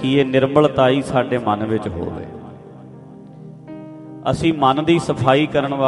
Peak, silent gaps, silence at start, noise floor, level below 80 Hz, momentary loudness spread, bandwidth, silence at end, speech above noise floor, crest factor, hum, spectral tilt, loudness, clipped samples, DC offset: 0 dBFS; none; 0 s; -39 dBFS; -48 dBFS; 22 LU; 11.5 kHz; 0 s; 22 dB; 18 dB; none; -6.5 dB/octave; -17 LUFS; under 0.1%; under 0.1%